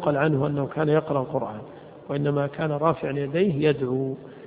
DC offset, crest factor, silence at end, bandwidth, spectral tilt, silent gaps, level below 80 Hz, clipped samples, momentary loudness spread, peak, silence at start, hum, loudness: under 0.1%; 18 dB; 0 s; 4.8 kHz; -12 dB/octave; none; -58 dBFS; under 0.1%; 10 LU; -8 dBFS; 0 s; none; -25 LUFS